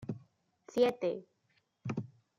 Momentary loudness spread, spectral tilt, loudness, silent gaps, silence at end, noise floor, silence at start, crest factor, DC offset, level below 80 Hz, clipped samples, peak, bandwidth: 16 LU; -7 dB/octave; -35 LUFS; none; 0.3 s; -76 dBFS; 0 s; 20 dB; under 0.1%; -76 dBFS; under 0.1%; -16 dBFS; 14.5 kHz